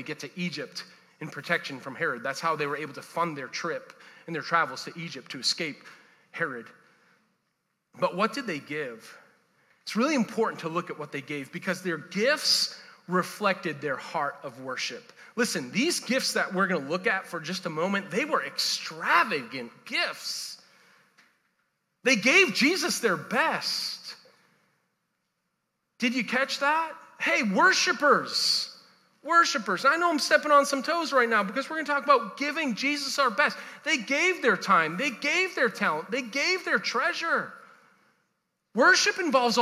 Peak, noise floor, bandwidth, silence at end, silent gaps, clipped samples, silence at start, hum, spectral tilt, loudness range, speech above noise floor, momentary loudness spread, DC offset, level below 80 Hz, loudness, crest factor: -6 dBFS; -79 dBFS; 16 kHz; 0 s; none; under 0.1%; 0 s; none; -3 dB/octave; 8 LU; 52 dB; 15 LU; under 0.1%; -88 dBFS; -26 LUFS; 22 dB